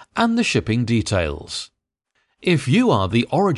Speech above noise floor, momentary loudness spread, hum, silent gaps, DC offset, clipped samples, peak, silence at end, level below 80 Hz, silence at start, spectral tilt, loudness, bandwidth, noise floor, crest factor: 52 dB; 12 LU; none; none; under 0.1%; under 0.1%; -4 dBFS; 0 s; -40 dBFS; 0 s; -5.5 dB/octave; -20 LUFS; 11.5 kHz; -71 dBFS; 16 dB